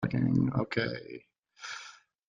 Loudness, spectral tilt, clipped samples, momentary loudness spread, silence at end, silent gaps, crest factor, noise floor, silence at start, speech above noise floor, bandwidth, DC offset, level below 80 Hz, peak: -31 LUFS; -7 dB/octave; under 0.1%; 20 LU; 0.35 s; none; 18 dB; -52 dBFS; 0 s; 22 dB; 7.4 kHz; under 0.1%; -60 dBFS; -14 dBFS